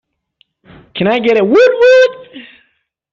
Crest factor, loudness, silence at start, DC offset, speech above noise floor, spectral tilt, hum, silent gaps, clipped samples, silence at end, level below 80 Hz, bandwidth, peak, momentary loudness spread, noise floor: 12 dB; -10 LUFS; 0.95 s; under 0.1%; 52 dB; -5.5 dB/octave; none; none; under 0.1%; 0.7 s; -54 dBFS; 7.2 kHz; -2 dBFS; 15 LU; -62 dBFS